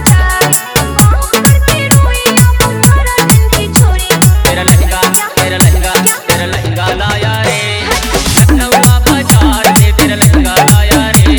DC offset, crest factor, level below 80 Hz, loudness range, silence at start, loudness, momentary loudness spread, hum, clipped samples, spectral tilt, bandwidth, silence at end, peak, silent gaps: under 0.1%; 8 dB; -14 dBFS; 3 LU; 0 s; -8 LUFS; 5 LU; none; 2%; -4 dB/octave; over 20 kHz; 0 s; 0 dBFS; none